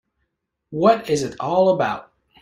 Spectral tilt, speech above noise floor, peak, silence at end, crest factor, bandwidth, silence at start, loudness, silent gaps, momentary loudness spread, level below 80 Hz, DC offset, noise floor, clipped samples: -5.5 dB/octave; 57 dB; -2 dBFS; 0.4 s; 18 dB; 15.5 kHz; 0.7 s; -19 LUFS; none; 11 LU; -58 dBFS; under 0.1%; -75 dBFS; under 0.1%